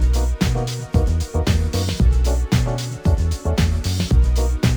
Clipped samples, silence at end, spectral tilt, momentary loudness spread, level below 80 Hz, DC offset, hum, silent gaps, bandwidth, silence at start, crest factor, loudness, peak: under 0.1%; 0 s; -6 dB/octave; 4 LU; -20 dBFS; under 0.1%; none; none; over 20 kHz; 0 s; 14 dB; -20 LUFS; -4 dBFS